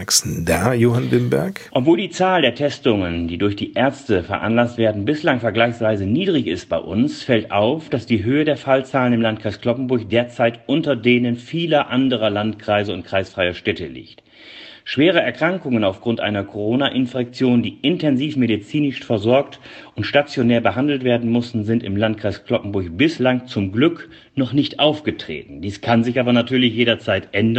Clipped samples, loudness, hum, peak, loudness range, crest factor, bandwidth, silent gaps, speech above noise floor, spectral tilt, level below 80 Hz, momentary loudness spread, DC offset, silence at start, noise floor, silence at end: under 0.1%; -19 LUFS; none; 0 dBFS; 2 LU; 18 dB; 16 kHz; none; 22 dB; -5 dB/octave; -50 dBFS; 7 LU; under 0.1%; 0 s; -41 dBFS; 0 s